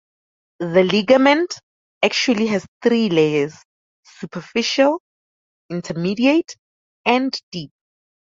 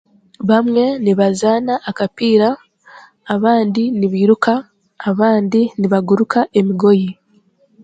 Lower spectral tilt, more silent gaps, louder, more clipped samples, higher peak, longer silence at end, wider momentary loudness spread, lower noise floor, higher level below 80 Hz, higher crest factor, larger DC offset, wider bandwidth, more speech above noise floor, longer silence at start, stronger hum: second, -5 dB/octave vs -7 dB/octave; first, 1.63-2.01 s, 2.68-2.81 s, 3.65-4.03 s, 5.00-5.69 s, 6.59-7.04 s, 7.43-7.52 s vs none; second, -18 LUFS vs -15 LUFS; neither; about the same, -2 dBFS vs 0 dBFS; about the same, 0.7 s vs 0.7 s; first, 17 LU vs 8 LU; first, under -90 dBFS vs -55 dBFS; about the same, -62 dBFS vs -60 dBFS; about the same, 18 dB vs 16 dB; neither; second, 7.8 kHz vs 9.2 kHz; first, over 72 dB vs 41 dB; first, 0.6 s vs 0.4 s; neither